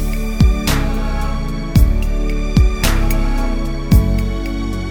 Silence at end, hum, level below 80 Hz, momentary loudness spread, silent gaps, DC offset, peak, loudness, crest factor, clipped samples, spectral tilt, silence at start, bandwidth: 0 s; none; -16 dBFS; 8 LU; none; under 0.1%; 0 dBFS; -18 LUFS; 14 dB; under 0.1%; -6 dB/octave; 0 s; over 20 kHz